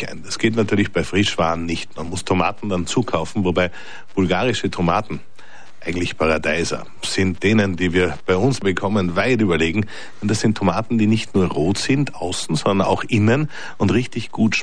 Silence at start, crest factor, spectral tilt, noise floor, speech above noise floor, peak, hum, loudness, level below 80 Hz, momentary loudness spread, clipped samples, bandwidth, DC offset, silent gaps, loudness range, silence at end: 0 s; 14 dB; -5.5 dB/octave; -46 dBFS; 26 dB; -6 dBFS; none; -20 LUFS; -44 dBFS; 9 LU; under 0.1%; 11 kHz; 3%; none; 3 LU; 0 s